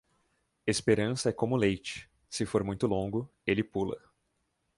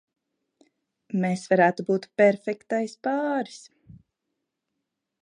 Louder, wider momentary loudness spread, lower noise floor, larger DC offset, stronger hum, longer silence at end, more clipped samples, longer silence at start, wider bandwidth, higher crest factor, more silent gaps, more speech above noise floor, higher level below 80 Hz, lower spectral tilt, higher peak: second, -31 LUFS vs -24 LUFS; about the same, 11 LU vs 10 LU; second, -78 dBFS vs -82 dBFS; neither; neither; second, 0.8 s vs 1.65 s; neither; second, 0.65 s vs 1.15 s; about the same, 11.5 kHz vs 10.5 kHz; about the same, 20 dB vs 20 dB; neither; second, 48 dB vs 58 dB; first, -56 dBFS vs -72 dBFS; about the same, -5.5 dB/octave vs -6.5 dB/octave; second, -12 dBFS vs -6 dBFS